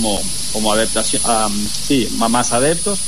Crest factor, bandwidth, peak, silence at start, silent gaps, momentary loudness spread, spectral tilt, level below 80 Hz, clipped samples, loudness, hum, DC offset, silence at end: 14 dB; 13.5 kHz; -2 dBFS; 0 s; none; 4 LU; -2.5 dB/octave; -36 dBFS; under 0.1%; -16 LUFS; none; 7%; 0 s